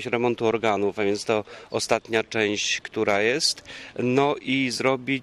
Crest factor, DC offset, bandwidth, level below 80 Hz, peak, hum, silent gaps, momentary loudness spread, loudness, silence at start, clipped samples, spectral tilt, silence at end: 16 dB; under 0.1%; 13 kHz; -62 dBFS; -8 dBFS; none; none; 6 LU; -24 LUFS; 0 s; under 0.1%; -3.5 dB/octave; 0 s